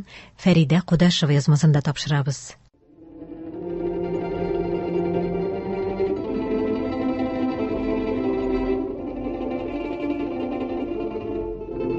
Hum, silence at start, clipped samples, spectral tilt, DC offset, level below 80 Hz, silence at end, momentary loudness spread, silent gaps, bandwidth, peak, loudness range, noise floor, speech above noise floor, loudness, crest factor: none; 0 s; under 0.1%; -6.5 dB/octave; under 0.1%; -44 dBFS; 0 s; 12 LU; none; 8.4 kHz; -6 dBFS; 6 LU; -50 dBFS; 31 dB; -24 LUFS; 18 dB